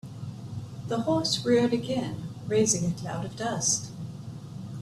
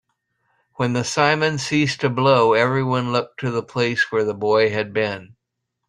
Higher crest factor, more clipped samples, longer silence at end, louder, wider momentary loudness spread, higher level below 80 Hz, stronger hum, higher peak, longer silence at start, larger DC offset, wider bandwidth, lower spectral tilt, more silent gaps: about the same, 18 dB vs 18 dB; neither; second, 0 s vs 0.6 s; second, -27 LUFS vs -19 LUFS; first, 16 LU vs 9 LU; about the same, -58 dBFS vs -58 dBFS; neither; second, -10 dBFS vs -2 dBFS; second, 0.05 s vs 0.8 s; neither; first, 14 kHz vs 11 kHz; about the same, -4 dB/octave vs -5 dB/octave; neither